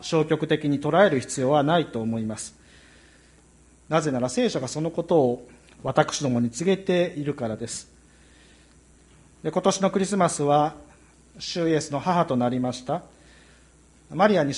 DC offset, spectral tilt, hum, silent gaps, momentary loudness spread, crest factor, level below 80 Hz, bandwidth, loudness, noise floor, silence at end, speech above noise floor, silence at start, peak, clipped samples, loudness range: under 0.1%; -5.5 dB/octave; none; none; 11 LU; 20 dB; -58 dBFS; 11.5 kHz; -24 LUFS; -55 dBFS; 0 s; 32 dB; 0 s; -4 dBFS; under 0.1%; 4 LU